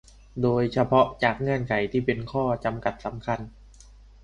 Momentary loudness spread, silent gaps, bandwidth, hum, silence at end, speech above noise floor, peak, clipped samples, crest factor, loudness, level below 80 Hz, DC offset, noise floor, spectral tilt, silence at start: 11 LU; none; 10 kHz; none; 0.75 s; 25 dB; -6 dBFS; under 0.1%; 20 dB; -25 LUFS; -48 dBFS; under 0.1%; -50 dBFS; -7.5 dB/octave; 0.35 s